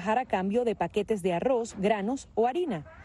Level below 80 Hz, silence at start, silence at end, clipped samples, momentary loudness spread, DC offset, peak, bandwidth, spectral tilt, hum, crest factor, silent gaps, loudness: -58 dBFS; 0 s; 0 s; under 0.1%; 4 LU; under 0.1%; -12 dBFS; 12.5 kHz; -6 dB/octave; none; 16 dB; none; -29 LUFS